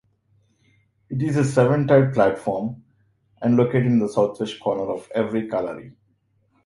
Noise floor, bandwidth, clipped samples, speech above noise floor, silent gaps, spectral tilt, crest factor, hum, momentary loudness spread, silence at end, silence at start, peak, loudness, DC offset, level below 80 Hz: -66 dBFS; 11.5 kHz; under 0.1%; 45 dB; none; -7.5 dB/octave; 18 dB; none; 12 LU; 0.75 s; 1.1 s; -4 dBFS; -21 LUFS; under 0.1%; -58 dBFS